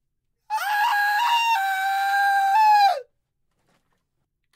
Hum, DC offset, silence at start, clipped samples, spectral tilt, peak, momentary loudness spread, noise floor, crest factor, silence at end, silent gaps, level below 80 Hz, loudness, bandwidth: none; under 0.1%; 0.5 s; under 0.1%; 3.5 dB/octave; -8 dBFS; 9 LU; -75 dBFS; 14 dB; 1.55 s; none; -78 dBFS; -20 LUFS; 16 kHz